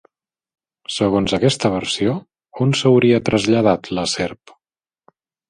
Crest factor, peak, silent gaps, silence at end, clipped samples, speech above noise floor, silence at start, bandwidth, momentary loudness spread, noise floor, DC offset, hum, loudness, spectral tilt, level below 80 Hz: 18 dB; -2 dBFS; none; 1.15 s; under 0.1%; 72 dB; 0.9 s; 11.5 kHz; 11 LU; -89 dBFS; under 0.1%; none; -18 LUFS; -5.5 dB/octave; -48 dBFS